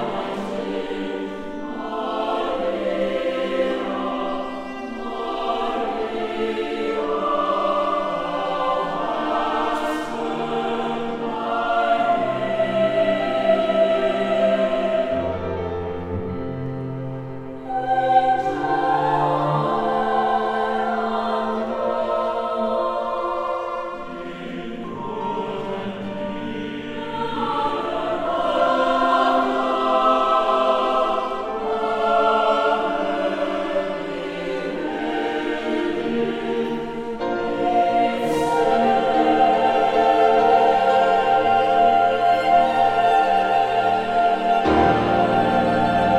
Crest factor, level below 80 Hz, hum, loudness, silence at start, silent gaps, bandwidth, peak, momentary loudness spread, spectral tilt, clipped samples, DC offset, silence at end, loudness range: 16 dB; -50 dBFS; none; -21 LUFS; 0 s; none; 11.5 kHz; -4 dBFS; 11 LU; -6 dB/octave; under 0.1%; under 0.1%; 0 s; 8 LU